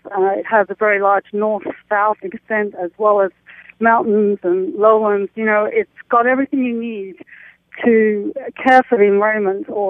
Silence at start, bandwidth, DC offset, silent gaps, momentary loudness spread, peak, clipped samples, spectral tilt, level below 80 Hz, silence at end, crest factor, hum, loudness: 0.05 s; 6 kHz; under 0.1%; none; 9 LU; 0 dBFS; under 0.1%; -8 dB/octave; -66 dBFS; 0 s; 16 dB; none; -16 LUFS